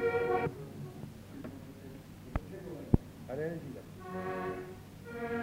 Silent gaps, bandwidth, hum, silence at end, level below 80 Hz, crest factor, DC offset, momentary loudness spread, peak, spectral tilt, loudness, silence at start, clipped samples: none; 16 kHz; none; 0 s; -50 dBFS; 28 dB; under 0.1%; 16 LU; -8 dBFS; -7.5 dB/octave; -38 LUFS; 0 s; under 0.1%